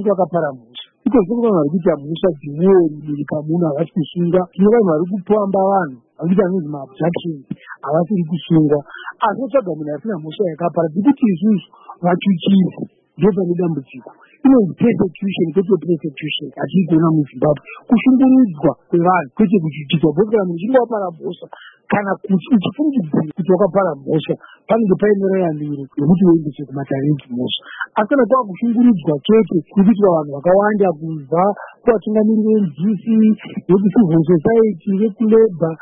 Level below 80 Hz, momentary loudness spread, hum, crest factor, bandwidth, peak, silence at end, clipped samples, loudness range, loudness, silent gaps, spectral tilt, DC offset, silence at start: -52 dBFS; 10 LU; none; 14 dB; 3.8 kHz; -2 dBFS; 0.05 s; under 0.1%; 4 LU; -16 LUFS; none; -13 dB/octave; under 0.1%; 0 s